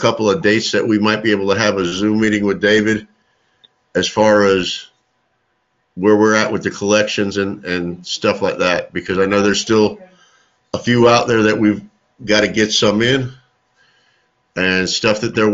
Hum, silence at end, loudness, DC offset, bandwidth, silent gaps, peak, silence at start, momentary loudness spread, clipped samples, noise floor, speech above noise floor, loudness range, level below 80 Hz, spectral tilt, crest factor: none; 0 s; -15 LUFS; under 0.1%; 8 kHz; none; 0 dBFS; 0 s; 10 LU; under 0.1%; -65 dBFS; 51 dB; 3 LU; -50 dBFS; -4.5 dB/octave; 16 dB